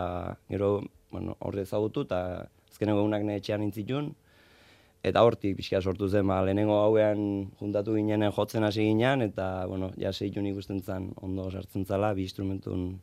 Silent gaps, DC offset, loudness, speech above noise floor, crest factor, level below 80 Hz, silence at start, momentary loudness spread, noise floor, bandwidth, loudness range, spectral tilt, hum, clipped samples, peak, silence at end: none; under 0.1%; -29 LUFS; 30 dB; 22 dB; -62 dBFS; 0 s; 11 LU; -59 dBFS; 15 kHz; 6 LU; -7.5 dB/octave; none; under 0.1%; -6 dBFS; 0 s